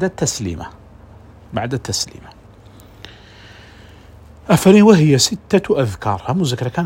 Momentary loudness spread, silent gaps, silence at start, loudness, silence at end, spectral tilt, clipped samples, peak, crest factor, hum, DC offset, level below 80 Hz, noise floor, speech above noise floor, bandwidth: 17 LU; none; 0 s; -15 LUFS; 0 s; -5 dB/octave; under 0.1%; 0 dBFS; 18 dB; none; under 0.1%; -46 dBFS; -42 dBFS; 27 dB; 16.5 kHz